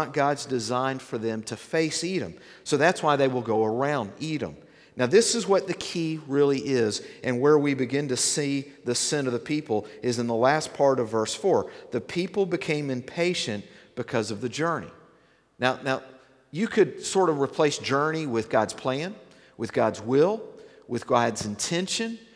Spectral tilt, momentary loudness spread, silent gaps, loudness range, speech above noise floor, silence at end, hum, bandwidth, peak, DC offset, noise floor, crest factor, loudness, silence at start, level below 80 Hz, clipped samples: -4 dB/octave; 9 LU; none; 4 LU; 35 dB; 0.1 s; none; 11 kHz; -6 dBFS; under 0.1%; -60 dBFS; 20 dB; -26 LUFS; 0 s; -66 dBFS; under 0.1%